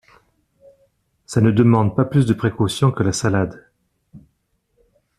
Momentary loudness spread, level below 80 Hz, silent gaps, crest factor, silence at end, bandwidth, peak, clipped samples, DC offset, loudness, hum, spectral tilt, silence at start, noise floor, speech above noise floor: 7 LU; -50 dBFS; none; 18 dB; 1 s; 13 kHz; -2 dBFS; under 0.1%; under 0.1%; -18 LUFS; none; -6.5 dB/octave; 1.3 s; -68 dBFS; 51 dB